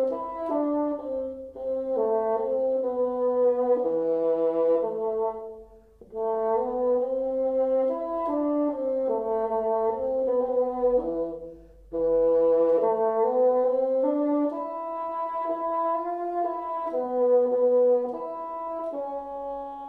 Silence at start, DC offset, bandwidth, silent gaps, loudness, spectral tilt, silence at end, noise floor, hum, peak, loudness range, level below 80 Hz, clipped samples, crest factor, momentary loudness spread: 0 s; under 0.1%; 3.5 kHz; none; -26 LUFS; -9 dB/octave; 0 s; -51 dBFS; none; -12 dBFS; 3 LU; -58 dBFS; under 0.1%; 12 dB; 11 LU